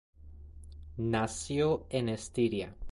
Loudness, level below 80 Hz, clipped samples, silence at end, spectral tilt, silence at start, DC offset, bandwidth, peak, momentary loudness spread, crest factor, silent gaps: -32 LUFS; -50 dBFS; under 0.1%; 0 s; -5.5 dB/octave; 0.2 s; under 0.1%; 11.5 kHz; -18 dBFS; 21 LU; 16 dB; none